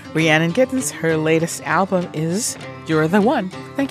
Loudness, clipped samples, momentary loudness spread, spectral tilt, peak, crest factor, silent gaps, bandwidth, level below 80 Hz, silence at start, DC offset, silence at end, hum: -19 LUFS; under 0.1%; 8 LU; -5 dB/octave; -2 dBFS; 18 dB; none; 15.5 kHz; -58 dBFS; 0 s; under 0.1%; 0 s; none